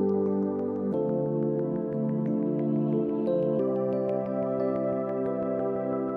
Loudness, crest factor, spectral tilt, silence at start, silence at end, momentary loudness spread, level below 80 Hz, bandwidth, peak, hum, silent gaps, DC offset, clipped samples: -28 LUFS; 12 dB; -12 dB/octave; 0 s; 0 s; 3 LU; -68 dBFS; 4.7 kHz; -16 dBFS; none; none; under 0.1%; under 0.1%